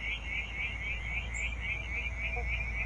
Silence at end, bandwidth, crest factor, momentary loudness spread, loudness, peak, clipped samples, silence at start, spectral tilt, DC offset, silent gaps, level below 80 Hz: 0 s; 9 kHz; 14 dB; 2 LU; -35 LUFS; -22 dBFS; under 0.1%; 0 s; -3.5 dB/octave; under 0.1%; none; -40 dBFS